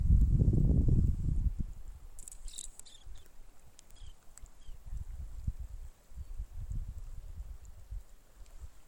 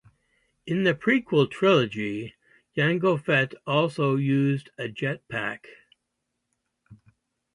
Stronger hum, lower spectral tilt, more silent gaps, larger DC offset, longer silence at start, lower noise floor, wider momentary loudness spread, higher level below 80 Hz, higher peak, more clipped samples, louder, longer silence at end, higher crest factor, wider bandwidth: neither; about the same, -7.5 dB/octave vs -7 dB/octave; neither; neither; second, 0 s vs 0.65 s; second, -52 dBFS vs -80 dBFS; first, 27 LU vs 13 LU; first, -36 dBFS vs -66 dBFS; second, -14 dBFS vs -8 dBFS; neither; second, -34 LUFS vs -25 LUFS; second, 0.05 s vs 0.6 s; about the same, 20 dB vs 18 dB; first, 16 kHz vs 11 kHz